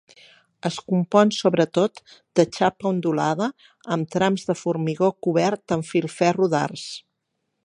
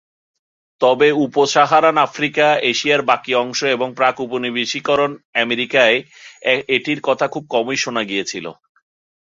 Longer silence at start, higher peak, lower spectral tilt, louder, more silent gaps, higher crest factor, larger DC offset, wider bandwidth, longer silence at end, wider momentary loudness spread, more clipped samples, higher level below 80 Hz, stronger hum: second, 0.65 s vs 0.8 s; about the same, -2 dBFS vs 0 dBFS; first, -6 dB/octave vs -3 dB/octave; second, -22 LUFS vs -17 LUFS; second, none vs 5.25-5.33 s; about the same, 20 dB vs 18 dB; neither; first, 11 kHz vs 7.8 kHz; second, 0.65 s vs 0.85 s; about the same, 10 LU vs 8 LU; neither; about the same, -66 dBFS vs -64 dBFS; neither